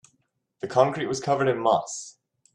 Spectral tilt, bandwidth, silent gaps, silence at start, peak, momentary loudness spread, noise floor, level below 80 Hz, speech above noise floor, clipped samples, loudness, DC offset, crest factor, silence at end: -5 dB/octave; 11 kHz; none; 0.65 s; -4 dBFS; 15 LU; -73 dBFS; -68 dBFS; 49 dB; under 0.1%; -24 LUFS; under 0.1%; 22 dB; 0.45 s